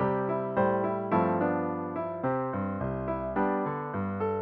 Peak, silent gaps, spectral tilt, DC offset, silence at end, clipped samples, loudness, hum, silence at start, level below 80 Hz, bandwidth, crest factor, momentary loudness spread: -14 dBFS; none; -8 dB/octave; under 0.1%; 0 s; under 0.1%; -30 LUFS; none; 0 s; -54 dBFS; 4.5 kHz; 16 dB; 6 LU